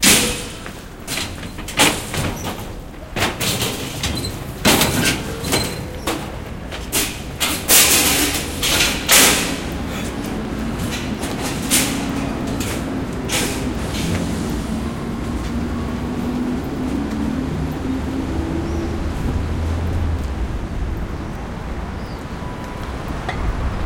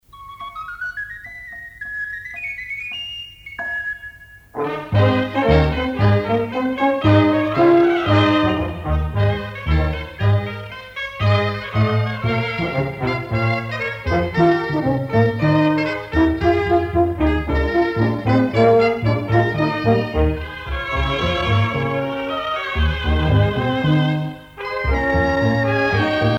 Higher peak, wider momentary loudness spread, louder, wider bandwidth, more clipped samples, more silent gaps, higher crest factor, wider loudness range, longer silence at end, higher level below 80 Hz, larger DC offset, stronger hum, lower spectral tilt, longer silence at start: first, 0 dBFS vs -4 dBFS; about the same, 15 LU vs 13 LU; about the same, -20 LUFS vs -19 LUFS; first, 17 kHz vs 7.4 kHz; neither; neither; about the same, 20 dB vs 16 dB; first, 10 LU vs 7 LU; about the same, 0 s vs 0 s; about the same, -30 dBFS vs -30 dBFS; neither; neither; second, -3 dB/octave vs -8 dB/octave; second, 0 s vs 0.15 s